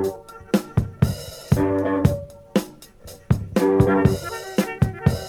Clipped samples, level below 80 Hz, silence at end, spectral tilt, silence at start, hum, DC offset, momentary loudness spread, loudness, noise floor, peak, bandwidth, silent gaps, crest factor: under 0.1%; -38 dBFS; 0 s; -7 dB/octave; 0 s; none; under 0.1%; 12 LU; -22 LUFS; -43 dBFS; -4 dBFS; 18 kHz; none; 18 dB